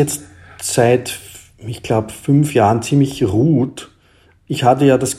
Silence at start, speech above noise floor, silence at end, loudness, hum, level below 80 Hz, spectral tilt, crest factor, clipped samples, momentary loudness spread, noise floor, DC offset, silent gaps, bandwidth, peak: 0 s; 37 dB; 0 s; -16 LUFS; none; -50 dBFS; -6 dB/octave; 16 dB; under 0.1%; 16 LU; -52 dBFS; under 0.1%; none; 15.5 kHz; 0 dBFS